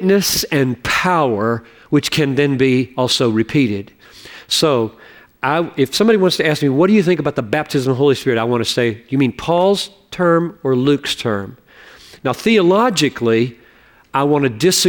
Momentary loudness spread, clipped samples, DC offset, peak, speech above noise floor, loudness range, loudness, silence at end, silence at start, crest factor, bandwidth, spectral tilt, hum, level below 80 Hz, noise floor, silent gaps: 8 LU; under 0.1%; under 0.1%; -4 dBFS; 33 dB; 2 LU; -16 LUFS; 0 s; 0 s; 12 dB; 19 kHz; -4.5 dB/octave; none; -50 dBFS; -49 dBFS; none